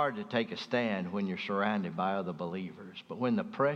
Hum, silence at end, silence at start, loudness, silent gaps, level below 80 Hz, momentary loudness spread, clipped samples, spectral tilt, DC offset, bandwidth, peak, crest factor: none; 0 s; 0 s; -33 LUFS; none; -78 dBFS; 9 LU; under 0.1%; -7 dB/octave; under 0.1%; 7.2 kHz; -14 dBFS; 18 dB